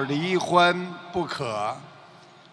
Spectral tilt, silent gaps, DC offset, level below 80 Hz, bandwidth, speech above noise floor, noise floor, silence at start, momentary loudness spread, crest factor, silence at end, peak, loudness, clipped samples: -5 dB/octave; none; under 0.1%; -64 dBFS; 11 kHz; 25 dB; -50 dBFS; 0 s; 12 LU; 20 dB; 0.45 s; -6 dBFS; -24 LUFS; under 0.1%